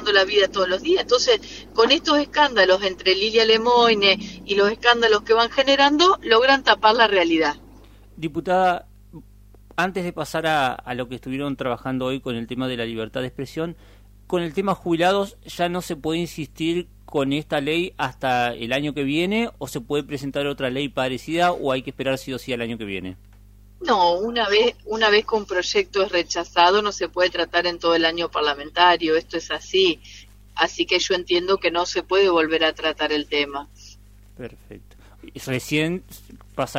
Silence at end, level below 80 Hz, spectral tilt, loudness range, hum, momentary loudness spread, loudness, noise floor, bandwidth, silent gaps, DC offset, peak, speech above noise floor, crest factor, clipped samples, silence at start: 0 s; -48 dBFS; -4 dB/octave; 9 LU; none; 13 LU; -21 LUFS; -48 dBFS; 16 kHz; none; under 0.1%; 0 dBFS; 27 dB; 22 dB; under 0.1%; 0 s